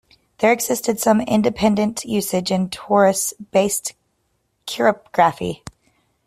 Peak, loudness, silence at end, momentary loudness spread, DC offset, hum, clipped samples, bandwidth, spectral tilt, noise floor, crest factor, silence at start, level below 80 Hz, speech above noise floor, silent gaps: -2 dBFS; -19 LUFS; 0.7 s; 12 LU; under 0.1%; none; under 0.1%; 16 kHz; -4 dB/octave; -68 dBFS; 18 dB; 0.4 s; -54 dBFS; 50 dB; none